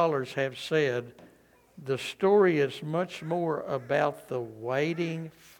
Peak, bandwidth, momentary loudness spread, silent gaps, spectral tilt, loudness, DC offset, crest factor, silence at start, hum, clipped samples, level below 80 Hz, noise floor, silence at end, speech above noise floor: -12 dBFS; 17.5 kHz; 12 LU; none; -6 dB/octave; -29 LUFS; under 0.1%; 18 dB; 0 s; none; under 0.1%; -72 dBFS; -60 dBFS; 0.3 s; 32 dB